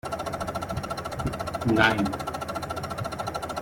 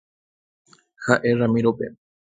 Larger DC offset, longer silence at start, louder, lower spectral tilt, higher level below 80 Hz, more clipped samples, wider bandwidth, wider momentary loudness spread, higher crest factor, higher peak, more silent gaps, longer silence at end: neither; second, 0.05 s vs 1 s; second, -28 LUFS vs -21 LUFS; second, -5 dB/octave vs -7 dB/octave; first, -46 dBFS vs -58 dBFS; neither; first, 16.5 kHz vs 9.2 kHz; about the same, 11 LU vs 13 LU; about the same, 24 dB vs 24 dB; second, -4 dBFS vs 0 dBFS; neither; second, 0 s vs 0.4 s